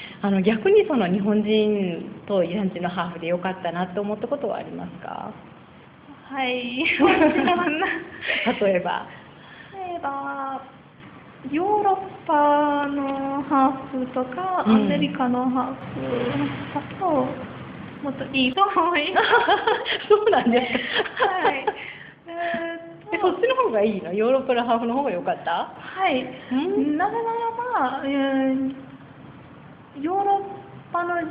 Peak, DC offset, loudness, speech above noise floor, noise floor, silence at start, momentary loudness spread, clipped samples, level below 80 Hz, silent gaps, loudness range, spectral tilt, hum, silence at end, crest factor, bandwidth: -4 dBFS; under 0.1%; -23 LUFS; 25 dB; -47 dBFS; 0 s; 15 LU; under 0.1%; -60 dBFS; none; 6 LU; -10 dB/octave; none; 0 s; 20 dB; 5.2 kHz